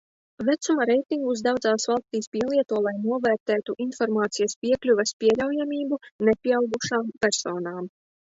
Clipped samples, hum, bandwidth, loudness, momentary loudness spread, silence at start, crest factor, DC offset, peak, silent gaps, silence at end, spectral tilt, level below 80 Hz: under 0.1%; none; 8 kHz; -25 LUFS; 7 LU; 0.4 s; 18 dB; under 0.1%; -8 dBFS; 2.27-2.32 s, 3.40-3.46 s, 4.56-4.62 s, 5.13-5.20 s, 6.11-6.19 s; 0.4 s; -4 dB/octave; -64 dBFS